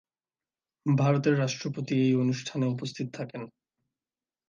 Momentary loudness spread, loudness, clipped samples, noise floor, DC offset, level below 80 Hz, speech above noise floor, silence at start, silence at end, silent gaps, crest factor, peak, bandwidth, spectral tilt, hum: 14 LU; -28 LUFS; under 0.1%; under -90 dBFS; under 0.1%; -74 dBFS; over 63 dB; 0.85 s; 1 s; none; 18 dB; -12 dBFS; 7.4 kHz; -6.5 dB/octave; none